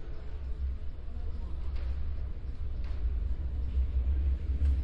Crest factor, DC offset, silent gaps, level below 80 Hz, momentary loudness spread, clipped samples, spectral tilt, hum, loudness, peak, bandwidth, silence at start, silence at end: 12 dB; under 0.1%; none; -32 dBFS; 10 LU; under 0.1%; -9 dB/octave; none; -36 LUFS; -20 dBFS; 4.9 kHz; 0 s; 0 s